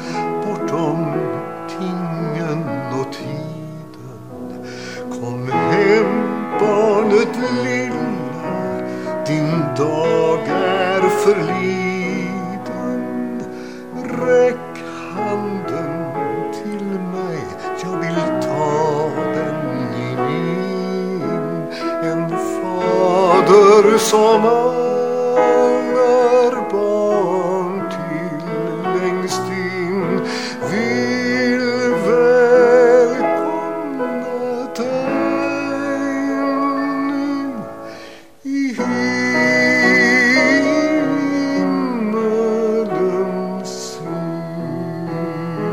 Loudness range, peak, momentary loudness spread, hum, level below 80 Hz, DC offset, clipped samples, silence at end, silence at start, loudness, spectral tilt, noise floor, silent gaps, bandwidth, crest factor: 9 LU; 0 dBFS; 13 LU; none; -60 dBFS; 0.5%; under 0.1%; 0 s; 0 s; -17 LUFS; -5.5 dB/octave; -38 dBFS; none; 15.5 kHz; 18 dB